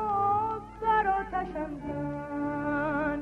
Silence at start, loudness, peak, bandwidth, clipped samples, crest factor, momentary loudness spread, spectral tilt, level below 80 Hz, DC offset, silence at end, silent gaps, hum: 0 s; -30 LUFS; -16 dBFS; 9.2 kHz; under 0.1%; 14 dB; 9 LU; -8 dB/octave; -50 dBFS; under 0.1%; 0 s; none; none